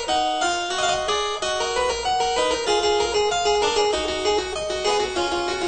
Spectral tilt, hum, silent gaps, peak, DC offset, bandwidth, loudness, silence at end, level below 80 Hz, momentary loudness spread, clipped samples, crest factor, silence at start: -2 dB/octave; none; none; -8 dBFS; 0.3%; 9.2 kHz; -22 LUFS; 0 s; -44 dBFS; 4 LU; under 0.1%; 14 dB; 0 s